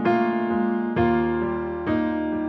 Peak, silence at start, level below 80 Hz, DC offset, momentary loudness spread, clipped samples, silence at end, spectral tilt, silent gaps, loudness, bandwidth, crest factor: -8 dBFS; 0 s; -44 dBFS; under 0.1%; 4 LU; under 0.1%; 0 s; -9.5 dB/octave; none; -23 LUFS; 5.8 kHz; 14 dB